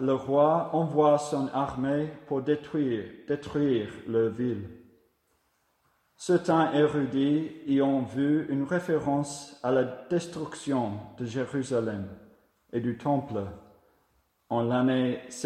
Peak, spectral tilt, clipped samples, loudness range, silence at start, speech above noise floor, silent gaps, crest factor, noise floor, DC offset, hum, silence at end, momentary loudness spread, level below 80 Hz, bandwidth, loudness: -10 dBFS; -6.5 dB/octave; under 0.1%; 6 LU; 0 s; 44 dB; none; 18 dB; -72 dBFS; under 0.1%; none; 0 s; 11 LU; -64 dBFS; 11 kHz; -28 LUFS